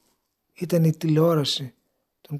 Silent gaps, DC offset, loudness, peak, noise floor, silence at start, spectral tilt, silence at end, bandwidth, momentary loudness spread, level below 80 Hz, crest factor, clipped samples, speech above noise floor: none; under 0.1%; -22 LUFS; -8 dBFS; -71 dBFS; 0.6 s; -6.5 dB/octave; 0 s; 15 kHz; 14 LU; -70 dBFS; 16 dB; under 0.1%; 50 dB